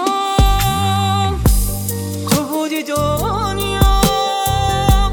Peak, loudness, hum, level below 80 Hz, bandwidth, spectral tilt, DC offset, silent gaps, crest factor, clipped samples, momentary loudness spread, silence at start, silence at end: 0 dBFS; -16 LUFS; none; -20 dBFS; 19 kHz; -4.5 dB/octave; under 0.1%; none; 14 dB; under 0.1%; 5 LU; 0 s; 0 s